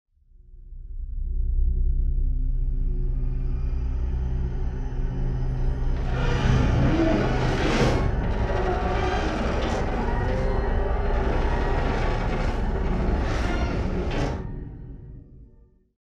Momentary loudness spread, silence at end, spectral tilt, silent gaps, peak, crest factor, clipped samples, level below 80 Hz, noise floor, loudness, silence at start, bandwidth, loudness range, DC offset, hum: 10 LU; 0.55 s; -7 dB/octave; none; -8 dBFS; 16 dB; under 0.1%; -26 dBFS; -54 dBFS; -26 LUFS; 0.5 s; 7.6 kHz; 6 LU; under 0.1%; none